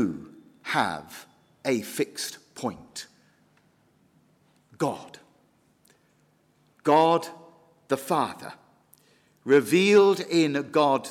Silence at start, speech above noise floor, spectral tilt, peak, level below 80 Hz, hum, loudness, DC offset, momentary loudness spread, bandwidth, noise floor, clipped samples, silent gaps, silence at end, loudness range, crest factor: 0 s; 41 dB; -5 dB/octave; -8 dBFS; -70 dBFS; none; -24 LUFS; under 0.1%; 22 LU; 16 kHz; -65 dBFS; under 0.1%; none; 0 s; 15 LU; 18 dB